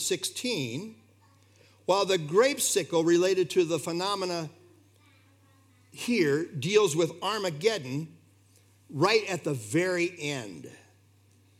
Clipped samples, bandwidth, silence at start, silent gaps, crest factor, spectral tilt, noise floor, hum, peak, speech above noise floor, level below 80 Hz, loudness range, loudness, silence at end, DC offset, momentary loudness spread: under 0.1%; 16.5 kHz; 0 s; none; 20 dB; -4 dB/octave; -61 dBFS; none; -10 dBFS; 34 dB; -82 dBFS; 4 LU; -27 LUFS; 0.85 s; under 0.1%; 13 LU